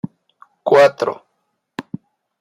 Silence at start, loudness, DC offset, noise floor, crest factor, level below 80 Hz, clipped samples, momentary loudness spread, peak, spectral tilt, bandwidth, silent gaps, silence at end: 0.05 s; -15 LUFS; under 0.1%; -71 dBFS; 18 dB; -68 dBFS; under 0.1%; 23 LU; -2 dBFS; -5.5 dB/octave; 12 kHz; none; 0.6 s